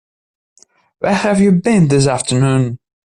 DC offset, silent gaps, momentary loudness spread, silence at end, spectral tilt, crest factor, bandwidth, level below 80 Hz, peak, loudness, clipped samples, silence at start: under 0.1%; none; 10 LU; 0.35 s; -6 dB/octave; 12 dB; 11 kHz; -46 dBFS; -2 dBFS; -14 LUFS; under 0.1%; 1 s